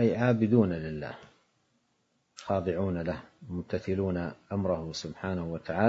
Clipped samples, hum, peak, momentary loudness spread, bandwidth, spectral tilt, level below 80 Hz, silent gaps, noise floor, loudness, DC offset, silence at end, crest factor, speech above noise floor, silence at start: under 0.1%; none; -10 dBFS; 15 LU; 7.8 kHz; -7.5 dB/octave; -60 dBFS; none; -74 dBFS; -31 LUFS; under 0.1%; 0 s; 20 dB; 45 dB; 0 s